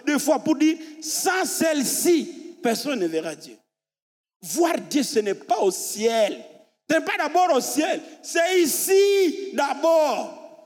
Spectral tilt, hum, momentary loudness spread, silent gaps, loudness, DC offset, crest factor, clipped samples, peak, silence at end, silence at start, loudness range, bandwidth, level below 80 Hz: -2.5 dB/octave; none; 10 LU; 4.02-4.24 s, 4.36-4.40 s; -22 LUFS; under 0.1%; 16 dB; under 0.1%; -8 dBFS; 0.1 s; 0.05 s; 5 LU; 18.5 kHz; -88 dBFS